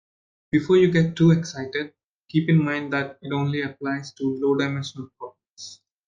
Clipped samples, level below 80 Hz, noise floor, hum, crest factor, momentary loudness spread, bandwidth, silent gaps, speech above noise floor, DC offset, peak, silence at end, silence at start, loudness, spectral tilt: under 0.1%; -60 dBFS; -44 dBFS; none; 16 dB; 21 LU; 7.4 kHz; 2.04-2.21 s, 5.50-5.55 s; 22 dB; under 0.1%; -6 dBFS; 0.35 s; 0.55 s; -23 LUFS; -7 dB/octave